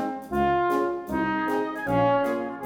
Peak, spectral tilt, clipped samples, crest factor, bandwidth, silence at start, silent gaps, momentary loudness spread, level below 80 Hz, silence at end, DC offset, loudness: -10 dBFS; -7 dB/octave; under 0.1%; 14 dB; 18.5 kHz; 0 s; none; 5 LU; -48 dBFS; 0 s; under 0.1%; -25 LUFS